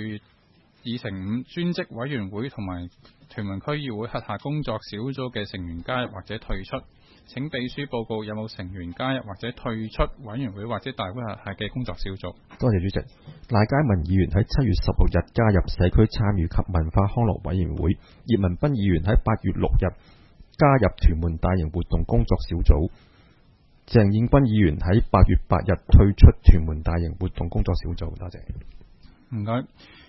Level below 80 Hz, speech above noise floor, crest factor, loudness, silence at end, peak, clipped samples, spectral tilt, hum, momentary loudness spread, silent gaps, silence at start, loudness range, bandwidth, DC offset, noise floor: -28 dBFS; 37 dB; 22 dB; -24 LUFS; 0.45 s; 0 dBFS; under 0.1%; -9.5 dB/octave; none; 15 LU; none; 0 s; 11 LU; 6 kHz; under 0.1%; -59 dBFS